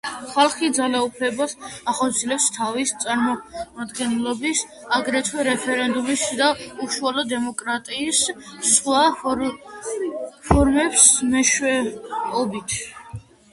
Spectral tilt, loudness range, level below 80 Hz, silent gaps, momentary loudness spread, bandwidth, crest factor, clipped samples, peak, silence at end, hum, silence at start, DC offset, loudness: -2.5 dB/octave; 5 LU; -40 dBFS; none; 11 LU; 11.5 kHz; 22 dB; under 0.1%; 0 dBFS; 0.3 s; none; 0.05 s; under 0.1%; -20 LUFS